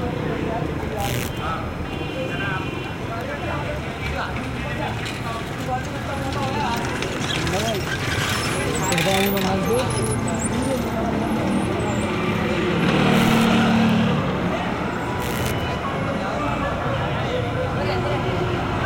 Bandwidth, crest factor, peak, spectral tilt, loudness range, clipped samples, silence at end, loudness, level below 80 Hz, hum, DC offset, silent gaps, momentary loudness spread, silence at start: 17 kHz; 18 dB; -4 dBFS; -5 dB/octave; 7 LU; under 0.1%; 0 s; -23 LUFS; -38 dBFS; none; under 0.1%; none; 9 LU; 0 s